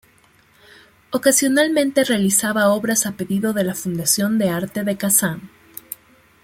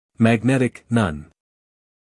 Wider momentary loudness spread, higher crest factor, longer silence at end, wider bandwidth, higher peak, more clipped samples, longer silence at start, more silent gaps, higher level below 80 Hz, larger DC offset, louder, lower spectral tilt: first, 18 LU vs 7 LU; about the same, 18 dB vs 20 dB; second, 0.5 s vs 0.85 s; first, 16.5 kHz vs 12 kHz; about the same, -2 dBFS vs -2 dBFS; neither; first, 1.1 s vs 0.2 s; neither; second, -58 dBFS vs -50 dBFS; neither; about the same, -18 LUFS vs -20 LUFS; second, -3.5 dB/octave vs -7 dB/octave